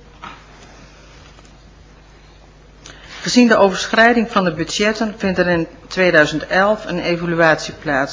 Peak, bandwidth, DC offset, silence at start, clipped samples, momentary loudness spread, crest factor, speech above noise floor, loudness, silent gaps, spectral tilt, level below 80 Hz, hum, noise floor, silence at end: 0 dBFS; 7.6 kHz; under 0.1%; 0.2 s; under 0.1%; 12 LU; 18 dB; 28 dB; -15 LUFS; none; -4.5 dB/octave; -44 dBFS; none; -44 dBFS; 0 s